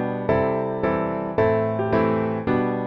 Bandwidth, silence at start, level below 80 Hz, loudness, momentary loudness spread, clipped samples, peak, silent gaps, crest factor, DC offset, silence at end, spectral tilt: 6 kHz; 0 s; -48 dBFS; -22 LUFS; 3 LU; under 0.1%; -6 dBFS; none; 16 dB; under 0.1%; 0 s; -10 dB/octave